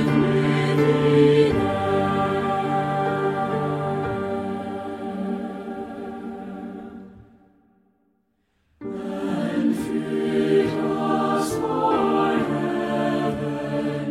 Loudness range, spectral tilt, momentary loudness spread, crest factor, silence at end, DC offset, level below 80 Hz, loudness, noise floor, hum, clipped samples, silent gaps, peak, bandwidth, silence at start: 14 LU; -7 dB/octave; 14 LU; 18 dB; 0 s; under 0.1%; -52 dBFS; -23 LUFS; -69 dBFS; none; under 0.1%; none; -6 dBFS; 14.5 kHz; 0 s